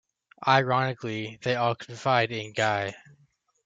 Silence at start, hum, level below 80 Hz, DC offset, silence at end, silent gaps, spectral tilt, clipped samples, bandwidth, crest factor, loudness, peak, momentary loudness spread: 0.4 s; none; -68 dBFS; under 0.1%; 0.65 s; none; -5 dB/octave; under 0.1%; 9 kHz; 22 dB; -26 LUFS; -6 dBFS; 10 LU